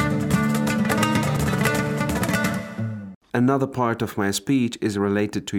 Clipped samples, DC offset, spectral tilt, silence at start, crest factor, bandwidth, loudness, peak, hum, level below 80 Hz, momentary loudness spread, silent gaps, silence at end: under 0.1%; under 0.1%; -5.5 dB/octave; 0 s; 16 dB; 18.5 kHz; -22 LUFS; -6 dBFS; none; -46 dBFS; 7 LU; 3.15-3.21 s; 0 s